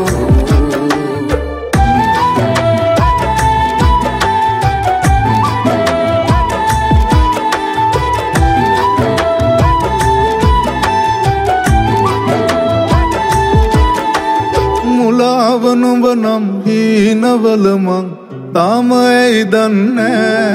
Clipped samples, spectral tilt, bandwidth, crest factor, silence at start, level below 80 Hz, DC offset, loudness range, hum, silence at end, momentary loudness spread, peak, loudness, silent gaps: under 0.1%; -6 dB/octave; 15.5 kHz; 10 dB; 0 s; -20 dBFS; under 0.1%; 1 LU; none; 0 s; 3 LU; 0 dBFS; -12 LUFS; none